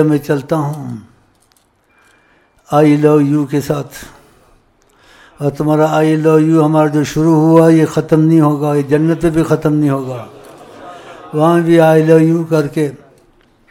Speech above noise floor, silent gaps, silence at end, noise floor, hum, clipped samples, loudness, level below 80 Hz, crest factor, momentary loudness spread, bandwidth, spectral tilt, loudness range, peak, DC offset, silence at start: 43 dB; none; 0.75 s; -55 dBFS; none; under 0.1%; -12 LUFS; -46 dBFS; 12 dB; 16 LU; 16 kHz; -8 dB/octave; 5 LU; 0 dBFS; under 0.1%; 0 s